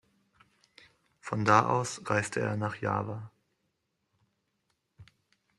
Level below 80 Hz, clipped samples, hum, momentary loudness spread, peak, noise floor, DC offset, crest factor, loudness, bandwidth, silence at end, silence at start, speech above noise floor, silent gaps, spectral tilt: -68 dBFS; under 0.1%; none; 18 LU; -8 dBFS; -79 dBFS; under 0.1%; 26 dB; -29 LUFS; 12 kHz; 0.55 s; 1.25 s; 51 dB; none; -5.5 dB/octave